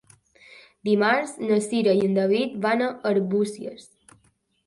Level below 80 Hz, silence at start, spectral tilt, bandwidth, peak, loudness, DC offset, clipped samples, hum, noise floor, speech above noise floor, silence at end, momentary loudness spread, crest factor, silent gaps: -68 dBFS; 0.85 s; -5.5 dB/octave; 11.5 kHz; -8 dBFS; -23 LUFS; under 0.1%; under 0.1%; none; -65 dBFS; 42 dB; 0.85 s; 8 LU; 18 dB; none